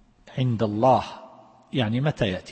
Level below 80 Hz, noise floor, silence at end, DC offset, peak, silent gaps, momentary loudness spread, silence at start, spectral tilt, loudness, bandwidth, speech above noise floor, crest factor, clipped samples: -54 dBFS; -49 dBFS; 0 s; under 0.1%; -6 dBFS; none; 17 LU; 0.25 s; -7.5 dB/octave; -24 LUFS; 8.6 kHz; 26 dB; 18 dB; under 0.1%